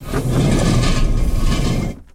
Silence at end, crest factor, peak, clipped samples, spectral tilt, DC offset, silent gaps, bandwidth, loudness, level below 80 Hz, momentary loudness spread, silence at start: 0.1 s; 12 dB; -4 dBFS; under 0.1%; -6 dB/octave; under 0.1%; none; 15.5 kHz; -18 LUFS; -18 dBFS; 5 LU; 0 s